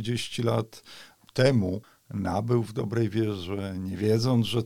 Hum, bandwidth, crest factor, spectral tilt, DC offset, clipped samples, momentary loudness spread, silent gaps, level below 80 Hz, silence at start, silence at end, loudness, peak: none; 15 kHz; 18 dB; -6.5 dB/octave; 0.2%; under 0.1%; 15 LU; none; -58 dBFS; 0 s; 0 s; -27 LUFS; -8 dBFS